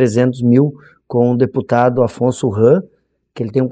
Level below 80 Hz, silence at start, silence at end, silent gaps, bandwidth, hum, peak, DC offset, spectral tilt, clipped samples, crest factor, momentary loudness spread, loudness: -54 dBFS; 0 s; 0 s; none; 9.4 kHz; none; 0 dBFS; under 0.1%; -8 dB/octave; under 0.1%; 14 dB; 7 LU; -15 LUFS